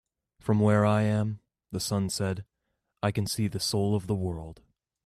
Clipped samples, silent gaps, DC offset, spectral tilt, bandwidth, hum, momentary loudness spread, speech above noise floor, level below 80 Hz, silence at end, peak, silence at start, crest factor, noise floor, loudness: under 0.1%; none; under 0.1%; -5.5 dB/octave; 14 kHz; none; 15 LU; 54 dB; -58 dBFS; 0.5 s; -12 dBFS; 0.45 s; 16 dB; -80 dBFS; -28 LUFS